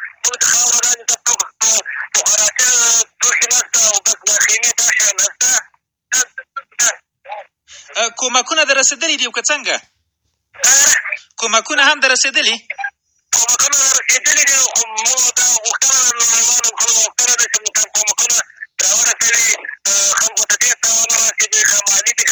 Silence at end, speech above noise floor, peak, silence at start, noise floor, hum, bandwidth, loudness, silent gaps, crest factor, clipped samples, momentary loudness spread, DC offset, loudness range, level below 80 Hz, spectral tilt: 0 s; 55 dB; 0 dBFS; 0 s; -69 dBFS; none; over 20 kHz; -12 LUFS; none; 16 dB; under 0.1%; 7 LU; under 0.1%; 5 LU; -66 dBFS; 3 dB/octave